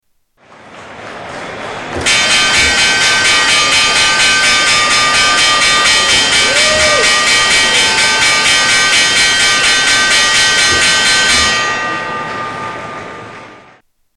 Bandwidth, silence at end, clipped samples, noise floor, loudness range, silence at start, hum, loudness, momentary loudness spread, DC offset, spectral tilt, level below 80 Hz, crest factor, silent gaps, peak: 13.5 kHz; 0.6 s; under 0.1%; -51 dBFS; 4 LU; 0.65 s; none; -8 LUFS; 15 LU; under 0.1%; 0 dB/octave; -38 dBFS; 12 dB; none; 0 dBFS